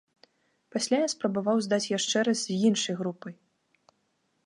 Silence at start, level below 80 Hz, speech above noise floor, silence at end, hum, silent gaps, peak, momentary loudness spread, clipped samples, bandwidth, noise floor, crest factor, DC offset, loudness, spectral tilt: 0.75 s; -78 dBFS; 47 dB; 1.15 s; none; none; -12 dBFS; 10 LU; under 0.1%; 11.5 kHz; -74 dBFS; 18 dB; under 0.1%; -27 LUFS; -4 dB/octave